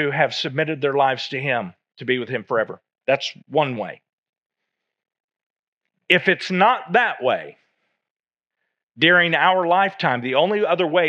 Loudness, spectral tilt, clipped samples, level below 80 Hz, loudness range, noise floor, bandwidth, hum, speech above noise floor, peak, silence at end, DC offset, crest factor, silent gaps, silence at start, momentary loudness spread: -20 LUFS; -5.5 dB/octave; under 0.1%; -82 dBFS; 7 LU; under -90 dBFS; 8.8 kHz; none; over 70 dB; 0 dBFS; 0 s; under 0.1%; 22 dB; 4.13-4.23 s, 4.29-4.50 s, 5.20-5.28 s, 5.43-5.77 s, 8.10-8.24 s, 8.83-8.87 s; 0 s; 9 LU